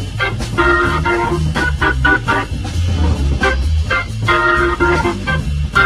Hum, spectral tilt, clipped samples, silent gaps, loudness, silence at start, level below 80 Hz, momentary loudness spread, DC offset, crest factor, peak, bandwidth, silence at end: none; -5.5 dB/octave; under 0.1%; none; -15 LUFS; 0 s; -20 dBFS; 6 LU; under 0.1%; 14 dB; 0 dBFS; 12.5 kHz; 0 s